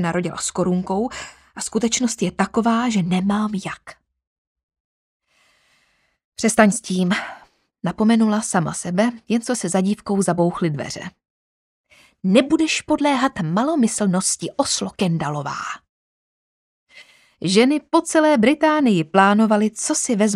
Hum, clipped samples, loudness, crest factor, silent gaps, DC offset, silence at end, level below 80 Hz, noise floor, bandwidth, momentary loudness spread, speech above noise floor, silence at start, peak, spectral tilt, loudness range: none; under 0.1%; -19 LUFS; 20 dB; 4.27-4.55 s, 4.63-4.69 s, 4.80-5.20 s, 6.25-6.32 s, 11.30-11.84 s, 15.89-16.86 s; under 0.1%; 0 s; -56 dBFS; -64 dBFS; 13.5 kHz; 12 LU; 45 dB; 0 s; 0 dBFS; -4.5 dB/octave; 6 LU